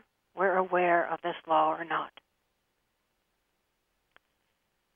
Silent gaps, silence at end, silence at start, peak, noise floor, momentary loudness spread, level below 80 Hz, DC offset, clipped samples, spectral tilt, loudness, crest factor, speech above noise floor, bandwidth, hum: none; 2.85 s; 0.35 s; -12 dBFS; -78 dBFS; 9 LU; -82 dBFS; under 0.1%; under 0.1%; -7.5 dB/octave; -28 LUFS; 20 dB; 49 dB; 3.7 kHz; none